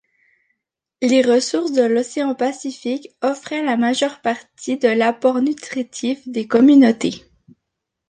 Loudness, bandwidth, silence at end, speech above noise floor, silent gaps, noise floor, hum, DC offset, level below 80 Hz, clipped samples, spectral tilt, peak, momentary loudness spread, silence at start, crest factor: -18 LUFS; 9.6 kHz; 0.9 s; 62 dB; none; -79 dBFS; none; under 0.1%; -66 dBFS; under 0.1%; -4 dB/octave; -2 dBFS; 13 LU; 1 s; 16 dB